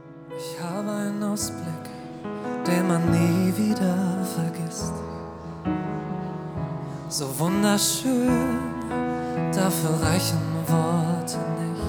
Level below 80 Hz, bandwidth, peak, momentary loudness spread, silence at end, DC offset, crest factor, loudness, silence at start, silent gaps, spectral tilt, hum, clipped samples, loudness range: -50 dBFS; over 20 kHz; -6 dBFS; 12 LU; 0 s; under 0.1%; 18 dB; -25 LUFS; 0 s; none; -5.5 dB/octave; none; under 0.1%; 5 LU